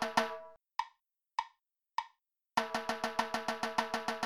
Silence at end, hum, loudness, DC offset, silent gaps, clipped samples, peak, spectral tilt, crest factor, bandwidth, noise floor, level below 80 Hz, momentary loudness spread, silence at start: 0 s; none; -37 LUFS; under 0.1%; none; under 0.1%; -14 dBFS; -2.5 dB/octave; 24 dB; 19.5 kHz; -75 dBFS; -72 dBFS; 11 LU; 0 s